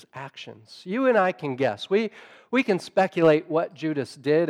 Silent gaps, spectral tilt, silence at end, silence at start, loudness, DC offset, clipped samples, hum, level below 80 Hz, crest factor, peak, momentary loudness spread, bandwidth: none; -6.5 dB/octave; 0 s; 0.15 s; -24 LUFS; under 0.1%; under 0.1%; none; -76 dBFS; 16 dB; -8 dBFS; 19 LU; 11.5 kHz